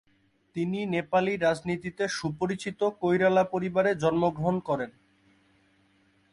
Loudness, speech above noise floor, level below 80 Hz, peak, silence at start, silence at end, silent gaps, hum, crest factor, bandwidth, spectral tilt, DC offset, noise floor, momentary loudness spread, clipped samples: -27 LUFS; 40 dB; -62 dBFS; -12 dBFS; 0.55 s; 1.4 s; none; none; 16 dB; 11.5 kHz; -6 dB/octave; under 0.1%; -67 dBFS; 8 LU; under 0.1%